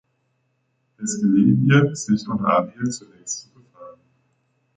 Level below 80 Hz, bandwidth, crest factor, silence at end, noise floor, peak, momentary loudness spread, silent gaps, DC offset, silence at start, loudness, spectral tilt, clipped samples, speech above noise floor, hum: -60 dBFS; 9.4 kHz; 18 dB; 0.85 s; -70 dBFS; -4 dBFS; 14 LU; none; under 0.1%; 1 s; -20 LUFS; -6 dB/octave; under 0.1%; 50 dB; none